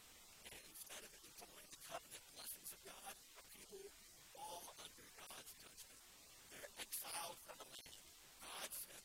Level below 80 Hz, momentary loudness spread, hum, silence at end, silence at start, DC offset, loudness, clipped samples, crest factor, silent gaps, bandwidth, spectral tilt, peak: -78 dBFS; 11 LU; none; 0 s; 0 s; under 0.1%; -54 LUFS; under 0.1%; 24 dB; none; 16.5 kHz; -0.5 dB/octave; -34 dBFS